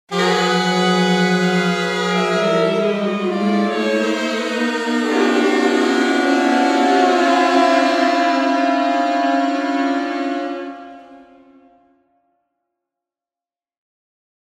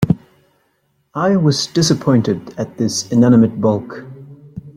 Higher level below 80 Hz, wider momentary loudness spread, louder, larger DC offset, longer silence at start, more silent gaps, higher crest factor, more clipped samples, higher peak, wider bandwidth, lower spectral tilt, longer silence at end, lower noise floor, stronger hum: second, -72 dBFS vs -50 dBFS; second, 6 LU vs 21 LU; about the same, -17 LUFS vs -15 LUFS; neither; about the same, 0.1 s vs 0 s; neither; about the same, 16 dB vs 16 dB; neither; about the same, -2 dBFS vs -2 dBFS; about the same, 14 kHz vs 14.5 kHz; about the same, -5 dB/octave vs -6 dB/octave; first, 3.3 s vs 0.05 s; first, under -90 dBFS vs -63 dBFS; neither